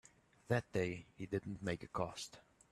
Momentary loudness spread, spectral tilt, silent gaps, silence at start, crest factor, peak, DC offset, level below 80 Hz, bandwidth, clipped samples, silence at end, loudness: 11 LU; -5.5 dB/octave; none; 0.5 s; 22 dB; -20 dBFS; under 0.1%; -68 dBFS; 13.5 kHz; under 0.1%; 0.3 s; -42 LUFS